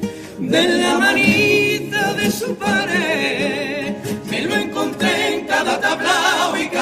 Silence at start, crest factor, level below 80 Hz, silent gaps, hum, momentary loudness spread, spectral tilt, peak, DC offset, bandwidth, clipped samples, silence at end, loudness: 0 s; 16 dB; -54 dBFS; none; none; 9 LU; -3.5 dB/octave; -2 dBFS; under 0.1%; 15.5 kHz; under 0.1%; 0 s; -17 LUFS